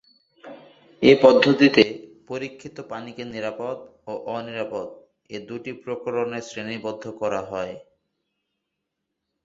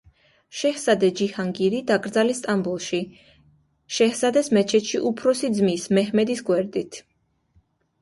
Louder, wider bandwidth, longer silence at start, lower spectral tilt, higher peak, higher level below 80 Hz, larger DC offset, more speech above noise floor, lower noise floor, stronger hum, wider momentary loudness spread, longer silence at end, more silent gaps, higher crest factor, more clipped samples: about the same, -22 LUFS vs -22 LUFS; second, 7.8 kHz vs 11.5 kHz; about the same, 0.45 s vs 0.55 s; about the same, -5.5 dB/octave vs -4.5 dB/octave; first, 0 dBFS vs -6 dBFS; about the same, -62 dBFS vs -64 dBFS; neither; first, 58 dB vs 43 dB; first, -81 dBFS vs -64 dBFS; neither; first, 20 LU vs 9 LU; first, 1.65 s vs 1 s; neither; first, 24 dB vs 18 dB; neither